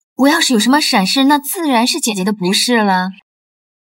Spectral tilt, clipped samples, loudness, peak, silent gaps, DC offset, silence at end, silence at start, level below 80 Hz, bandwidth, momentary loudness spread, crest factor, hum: -3 dB/octave; under 0.1%; -13 LUFS; 0 dBFS; none; under 0.1%; 0.7 s; 0.2 s; -70 dBFS; 16.5 kHz; 5 LU; 14 dB; none